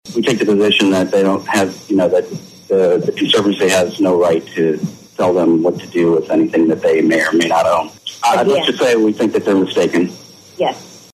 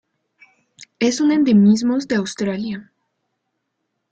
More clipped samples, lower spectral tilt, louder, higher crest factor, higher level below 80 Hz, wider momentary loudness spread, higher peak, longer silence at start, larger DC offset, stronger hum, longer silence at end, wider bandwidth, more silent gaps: neither; about the same, -4.5 dB/octave vs -5.5 dB/octave; first, -14 LUFS vs -17 LUFS; about the same, 14 dB vs 14 dB; about the same, -60 dBFS vs -60 dBFS; second, 6 LU vs 13 LU; first, -2 dBFS vs -6 dBFS; second, 0.05 s vs 0.8 s; neither; neither; second, 0.2 s vs 1.3 s; first, 15 kHz vs 8.8 kHz; neither